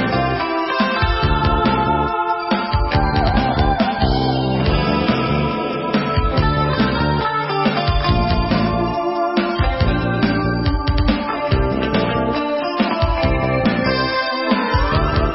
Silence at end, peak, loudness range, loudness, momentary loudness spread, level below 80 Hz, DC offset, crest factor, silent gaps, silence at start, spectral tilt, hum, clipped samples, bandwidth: 0 s; -4 dBFS; 1 LU; -18 LUFS; 3 LU; -24 dBFS; under 0.1%; 14 dB; none; 0 s; -10.5 dB/octave; none; under 0.1%; 5.8 kHz